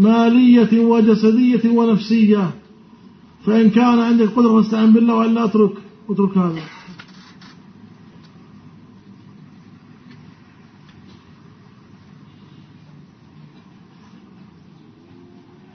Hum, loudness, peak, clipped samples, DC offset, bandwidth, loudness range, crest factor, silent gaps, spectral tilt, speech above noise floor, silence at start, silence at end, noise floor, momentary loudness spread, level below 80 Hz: none; -14 LUFS; -2 dBFS; under 0.1%; under 0.1%; 6.2 kHz; 11 LU; 16 dB; none; -8 dB/octave; 33 dB; 0 s; 8.8 s; -46 dBFS; 13 LU; -64 dBFS